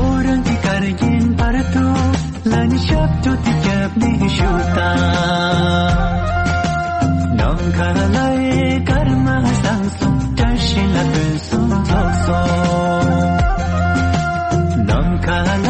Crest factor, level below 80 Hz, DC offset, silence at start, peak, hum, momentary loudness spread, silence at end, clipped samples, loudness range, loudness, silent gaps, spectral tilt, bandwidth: 10 dB; -24 dBFS; under 0.1%; 0 s; -4 dBFS; none; 2 LU; 0 s; under 0.1%; 1 LU; -16 LUFS; none; -6.5 dB/octave; 8.8 kHz